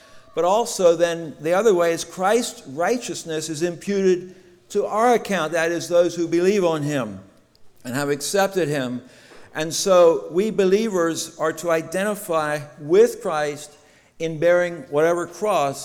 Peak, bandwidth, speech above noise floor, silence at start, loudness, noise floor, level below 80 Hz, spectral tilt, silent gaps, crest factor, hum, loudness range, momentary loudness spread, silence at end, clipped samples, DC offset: -6 dBFS; 17 kHz; 28 dB; 0.15 s; -21 LUFS; -49 dBFS; -62 dBFS; -4.5 dB/octave; none; 16 dB; none; 3 LU; 11 LU; 0 s; under 0.1%; under 0.1%